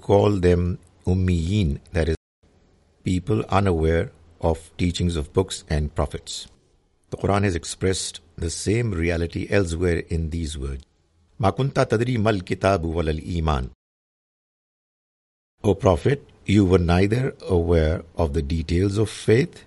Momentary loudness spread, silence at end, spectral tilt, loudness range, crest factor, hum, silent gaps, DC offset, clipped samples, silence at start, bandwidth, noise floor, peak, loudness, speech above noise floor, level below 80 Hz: 10 LU; 0.05 s; -6.5 dB/octave; 5 LU; 20 dB; none; 2.17-2.42 s, 13.75-15.58 s; under 0.1%; under 0.1%; 0.1 s; 11.5 kHz; -62 dBFS; -2 dBFS; -23 LUFS; 40 dB; -38 dBFS